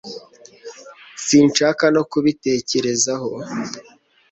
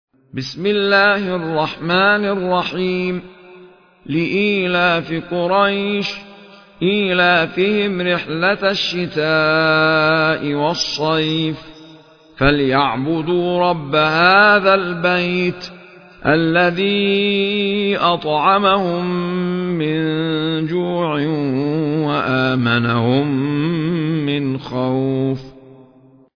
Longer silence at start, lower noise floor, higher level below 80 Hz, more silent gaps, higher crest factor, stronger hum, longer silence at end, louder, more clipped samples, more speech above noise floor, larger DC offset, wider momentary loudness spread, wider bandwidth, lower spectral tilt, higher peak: second, 0.05 s vs 0.35 s; second, -43 dBFS vs -48 dBFS; second, -60 dBFS vs -46 dBFS; neither; about the same, 18 dB vs 16 dB; neither; second, 0.5 s vs 0.65 s; about the same, -18 LUFS vs -16 LUFS; neither; second, 25 dB vs 32 dB; neither; first, 23 LU vs 8 LU; first, 8.4 kHz vs 5.4 kHz; second, -3.5 dB/octave vs -6 dB/octave; about the same, -2 dBFS vs 0 dBFS